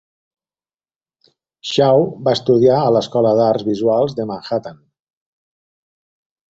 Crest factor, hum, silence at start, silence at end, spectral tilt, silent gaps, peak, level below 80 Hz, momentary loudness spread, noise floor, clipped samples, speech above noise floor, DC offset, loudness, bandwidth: 16 dB; none; 1.65 s; 1.75 s; -6.5 dB/octave; none; -2 dBFS; -58 dBFS; 11 LU; under -90 dBFS; under 0.1%; over 75 dB; under 0.1%; -16 LUFS; 7.8 kHz